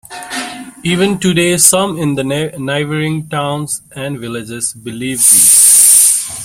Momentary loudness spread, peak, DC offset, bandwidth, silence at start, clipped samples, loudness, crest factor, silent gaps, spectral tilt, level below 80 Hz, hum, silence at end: 19 LU; 0 dBFS; under 0.1%; over 20 kHz; 0.1 s; 0.6%; -9 LUFS; 12 dB; none; -2.5 dB/octave; -50 dBFS; none; 0 s